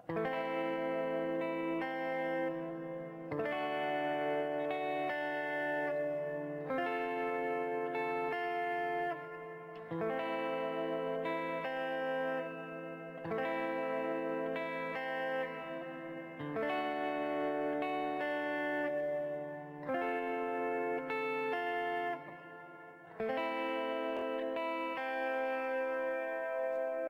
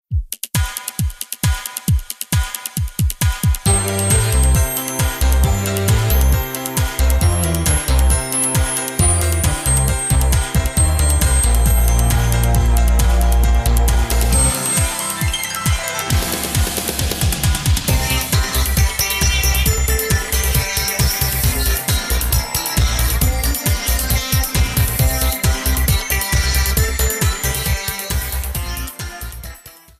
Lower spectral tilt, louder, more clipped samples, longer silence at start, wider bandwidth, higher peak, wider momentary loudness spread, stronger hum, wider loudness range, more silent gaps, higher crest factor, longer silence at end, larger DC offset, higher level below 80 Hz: first, -6.5 dB/octave vs -3.5 dB/octave; second, -37 LUFS vs -17 LUFS; neither; about the same, 0.05 s vs 0.1 s; about the same, 16 kHz vs 16 kHz; second, -26 dBFS vs -4 dBFS; about the same, 8 LU vs 6 LU; neither; about the same, 2 LU vs 3 LU; neither; about the same, 10 dB vs 14 dB; second, 0 s vs 0.3 s; neither; second, -80 dBFS vs -18 dBFS